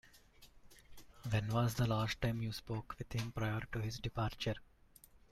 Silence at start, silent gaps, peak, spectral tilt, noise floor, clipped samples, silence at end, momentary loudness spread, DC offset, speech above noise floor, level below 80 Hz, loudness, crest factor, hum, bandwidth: 0.05 s; none; -22 dBFS; -6 dB/octave; -64 dBFS; under 0.1%; 0.15 s; 9 LU; under 0.1%; 26 dB; -56 dBFS; -39 LUFS; 18 dB; none; 14 kHz